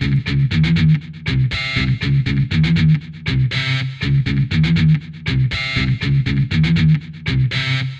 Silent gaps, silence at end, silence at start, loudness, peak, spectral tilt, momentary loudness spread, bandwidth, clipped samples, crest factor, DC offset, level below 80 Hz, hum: none; 0 s; 0 s; -17 LUFS; -6 dBFS; -7 dB/octave; 5 LU; 7.8 kHz; under 0.1%; 12 dB; under 0.1%; -32 dBFS; none